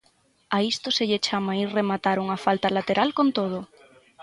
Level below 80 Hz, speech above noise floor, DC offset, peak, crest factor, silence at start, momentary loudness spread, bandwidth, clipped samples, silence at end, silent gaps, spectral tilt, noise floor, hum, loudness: -66 dBFS; 40 dB; under 0.1%; -6 dBFS; 18 dB; 0.5 s; 5 LU; 11.5 kHz; under 0.1%; 0 s; none; -5 dB/octave; -64 dBFS; none; -24 LUFS